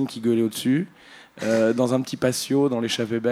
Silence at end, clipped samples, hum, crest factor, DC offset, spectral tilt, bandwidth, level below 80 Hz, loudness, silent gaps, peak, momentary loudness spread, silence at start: 0 s; under 0.1%; none; 18 dB; under 0.1%; -5 dB/octave; 16 kHz; -66 dBFS; -23 LUFS; none; -6 dBFS; 4 LU; 0 s